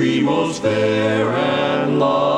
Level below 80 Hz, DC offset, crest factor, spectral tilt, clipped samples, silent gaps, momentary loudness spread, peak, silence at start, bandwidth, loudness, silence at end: -58 dBFS; 0.1%; 12 dB; -6 dB/octave; under 0.1%; none; 2 LU; -4 dBFS; 0 s; 11 kHz; -18 LUFS; 0 s